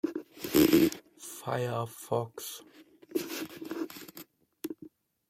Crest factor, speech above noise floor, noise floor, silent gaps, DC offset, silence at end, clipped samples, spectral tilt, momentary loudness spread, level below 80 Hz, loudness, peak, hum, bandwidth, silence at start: 22 dB; 20 dB; -54 dBFS; none; under 0.1%; 0.45 s; under 0.1%; -5 dB/octave; 21 LU; -64 dBFS; -31 LUFS; -10 dBFS; none; 16.5 kHz; 0.05 s